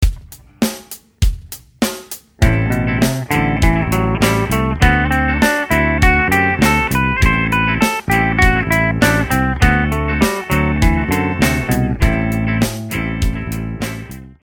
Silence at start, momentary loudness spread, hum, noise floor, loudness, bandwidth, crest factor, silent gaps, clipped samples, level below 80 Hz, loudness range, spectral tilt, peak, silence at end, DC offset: 0 s; 10 LU; none; -36 dBFS; -15 LUFS; 18.5 kHz; 16 dB; none; under 0.1%; -22 dBFS; 4 LU; -5.5 dB/octave; 0 dBFS; 0.1 s; under 0.1%